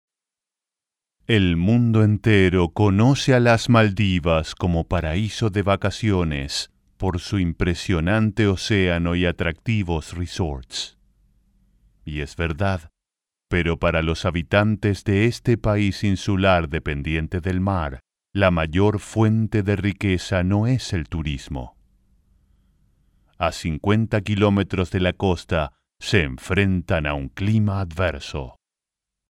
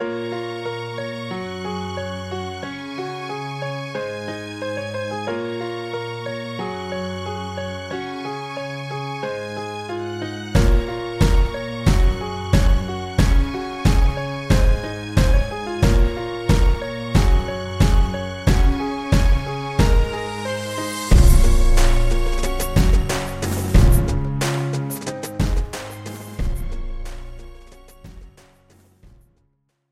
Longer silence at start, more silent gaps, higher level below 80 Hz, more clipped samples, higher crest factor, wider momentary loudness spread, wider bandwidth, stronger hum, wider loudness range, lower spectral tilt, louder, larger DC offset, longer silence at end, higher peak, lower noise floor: first, 1.3 s vs 0 s; neither; second, -38 dBFS vs -20 dBFS; neither; about the same, 18 dB vs 18 dB; about the same, 11 LU vs 10 LU; second, 12 kHz vs 15 kHz; neither; about the same, 9 LU vs 9 LU; about the same, -6.5 dB/octave vs -5.5 dB/octave; about the same, -21 LUFS vs -22 LUFS; neither; second, 0.9 s vs 1.6 s; about the same, -2 dBFS vs -2 dBFS; first, -88 dBFS vs -66 dBFS